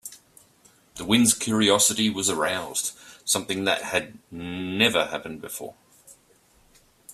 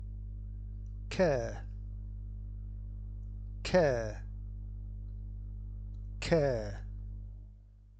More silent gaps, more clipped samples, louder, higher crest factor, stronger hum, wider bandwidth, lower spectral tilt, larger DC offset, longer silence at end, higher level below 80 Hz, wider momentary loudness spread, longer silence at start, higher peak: neither; neither; first, -23 LUFS vs -37 LUFS; about the same, 22 dB vs 20 dB; second, none vs 50 Hz at -40 dBFS; first, 15.5 kHz vs 8.6 kHz; second, -2.5 dB/octave vs -6.5 dB/octave; neither; about the same, 0 s vs 0 s; second, -62 dBFS vs -42 dBFS; first, 18 LU vs 15 LU; about the same, 0.05 s vs 0 s; first, -4 dBFS vs -16 dBFS